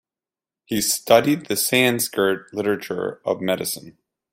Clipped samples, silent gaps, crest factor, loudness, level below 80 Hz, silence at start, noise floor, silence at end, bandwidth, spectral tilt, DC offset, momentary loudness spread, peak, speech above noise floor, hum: under 0.1%; none; 20 dB; -21 LUFS; -62 dBFS; 0.7 s; under -90 dBFS; 0.45 s; 16.5 kHz; -3 dB/octave; under 0.1%; 11 LU; -2 dBFS; over 69 dB; none